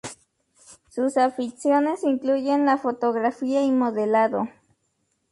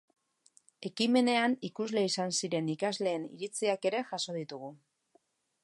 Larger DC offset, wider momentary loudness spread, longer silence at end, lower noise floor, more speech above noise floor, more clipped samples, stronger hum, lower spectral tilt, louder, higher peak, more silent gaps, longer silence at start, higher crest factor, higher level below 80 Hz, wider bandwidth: neither; second, 6 LU vs 15 LU; about the same, 0.8 s vs 0.9 s; about the same, -72 dBFS vs -71 dBFS; first, 50 dB vs 40 dB; neither; neither; first, -5.5 dB/octave vs -4 dB/octave; first, -23 LUFS vs -32 LUFS; first, -8 dBFS vs -14 dBFS; neither; second, 0.05 s vs 0.8 s; second, 14 dB vs 20 dB; first, -70 dBFS vs -84 dBFS; about the same, 11.5 kHz vs 11.5 kHz